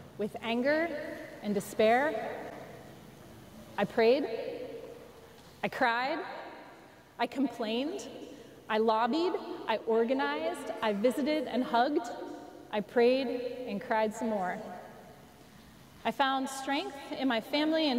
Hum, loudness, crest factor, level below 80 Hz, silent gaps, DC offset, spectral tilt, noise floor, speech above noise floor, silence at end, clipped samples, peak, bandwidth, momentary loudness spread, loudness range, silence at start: none; -31 LUFS; 16 dB; -68 dBFS; none; under 0.1%; -4.5 dB/octave; -55 dBFS; 24 dB; 0 s; under 0.1%; -16 dBFS; 16 kHz; 21 LU; 4 LU; 0 s